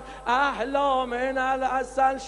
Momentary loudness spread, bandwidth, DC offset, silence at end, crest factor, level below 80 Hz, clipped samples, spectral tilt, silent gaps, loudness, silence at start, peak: 3 LU; 11.5 kHz; under 0.1%; 0 s; 14 dB; -48 dBFS; under 0.1%; -3.5 dB/octave; none; -25 LUFS; 0 s; -10 dBFS